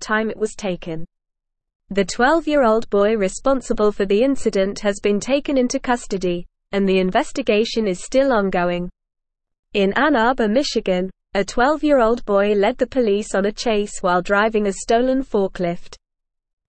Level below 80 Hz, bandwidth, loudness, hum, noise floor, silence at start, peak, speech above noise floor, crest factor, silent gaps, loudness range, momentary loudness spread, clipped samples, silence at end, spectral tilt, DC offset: -40 dBFS; 8.8 kHz; -19 LUFS; none; -79 dBFS; 0 s; -4 dBFS; 61 dB; 16 dB; 1.75-1.80 s, 9.59-9.63 s; 2 LU; 8 LU; under 0.1%; 0.75 s; -5 dB/octave; 0.4%